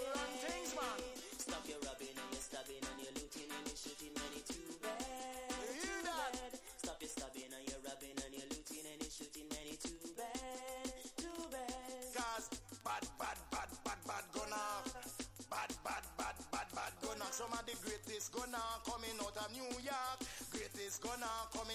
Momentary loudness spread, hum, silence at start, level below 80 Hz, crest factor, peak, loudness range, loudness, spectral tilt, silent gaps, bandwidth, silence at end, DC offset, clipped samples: 5 LU; none; 0 s; -64 dBFS; 18 dB; -28 dBFS; 3 LU; -46 LUFS; -2 dB/octave; none; 16 kHz; 0 s; under 0.1%; under 0.1%